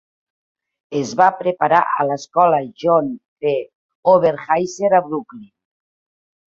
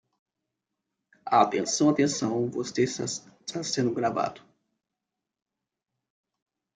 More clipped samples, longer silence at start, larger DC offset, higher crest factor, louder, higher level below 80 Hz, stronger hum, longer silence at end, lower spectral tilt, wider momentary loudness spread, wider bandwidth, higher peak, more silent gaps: neither; second, 0.9 s vs 1.25 s; neither; second, 18 dB vs 24 dB; first, -18 LUFS vs -27 LUFS; first, -64 dBFS vs -72 dBFS; neither; second, 1.05 s vs 2.4 s; about the same, -5.5 dB/octave vs -4.5 dB/octave; about the same, 10 LU vs 11 LU; second, 7.6 kHz vs 9.6 kHz; first, -2 dBFS vs -6 dBFS; first, 3.28-3.36 s, 3.75-3.89 s, 3.95-4.03 s vs none